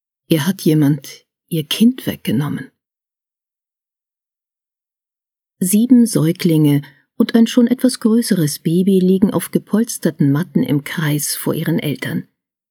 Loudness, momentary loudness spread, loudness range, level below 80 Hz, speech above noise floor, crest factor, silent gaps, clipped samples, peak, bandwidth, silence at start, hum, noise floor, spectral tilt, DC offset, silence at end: -16 LUFS; 10 LU; 9 LU; -60 dBFS; 74 dB; 16 dB; none; under 0.1%; 0 dBFS; over 20 kHz; 0.3 s; none; -89 dBFS; -6 dB/octave; under 0.1%; 0.5 s